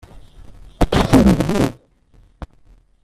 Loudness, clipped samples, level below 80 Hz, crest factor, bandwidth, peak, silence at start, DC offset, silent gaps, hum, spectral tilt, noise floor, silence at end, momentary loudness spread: -16 LUFS; under 0.1%; -30 dBFS; 18 dB; 14.5 kHz; 0 dBFS; 0.15 s; under 0.1%; none; none; -6.5 dB/octave; -51 dBFS; 0.6 s; 9 LU